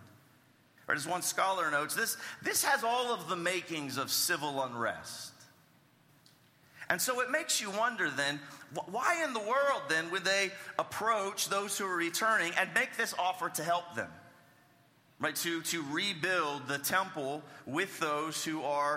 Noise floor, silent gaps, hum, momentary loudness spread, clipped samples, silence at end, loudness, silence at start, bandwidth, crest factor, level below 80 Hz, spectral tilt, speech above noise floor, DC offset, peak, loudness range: -65 dBFS; none; none; 8 LU; under 0.1%; 0 s; -32 LUFS; 0 s; 16.5 kHz; 22 dB; -80 dBFS; -2 dB/octave; 32 dB; under 0.1%; -12 dBFS; 4 LU